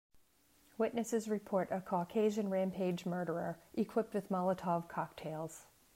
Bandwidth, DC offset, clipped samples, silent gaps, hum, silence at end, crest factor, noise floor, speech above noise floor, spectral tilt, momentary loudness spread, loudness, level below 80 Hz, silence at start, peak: 16 kHz; under 0.1%; under 0.1%; none; none; 0.3 s; 16 dB; -70 dBFS; 33 dB; -6.5 dB/octave; 9 LU; -38 LUFS; -74 dBFS; 0.8 s; -22 dBFS